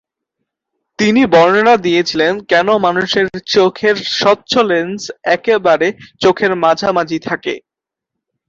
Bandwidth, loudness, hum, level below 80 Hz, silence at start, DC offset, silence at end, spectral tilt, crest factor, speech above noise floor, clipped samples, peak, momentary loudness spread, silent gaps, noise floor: 7.8 kHz; -13 LUFS; none; -54 dBFS; 1 s; under 0.1%; 0.9 s; -4.5 dB/octave; 14 dB; 68 dB; under 0.1%; 0 dBFS; 9 LU; none; -81 dBFS